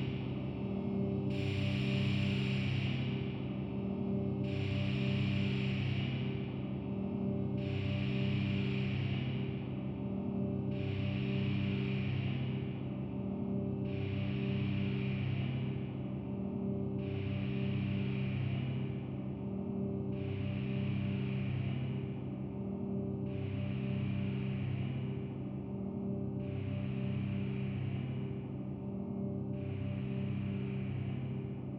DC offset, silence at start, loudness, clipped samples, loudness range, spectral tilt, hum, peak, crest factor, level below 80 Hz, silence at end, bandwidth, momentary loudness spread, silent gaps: under 0.1%; 0 s; -37 LUFS; under 0.1%; 3 LU; -9 dB/octave; none; -22 dBFS; 14 dB; -56 dBFS; 0 s; 5.8 kHz; 6 LU; none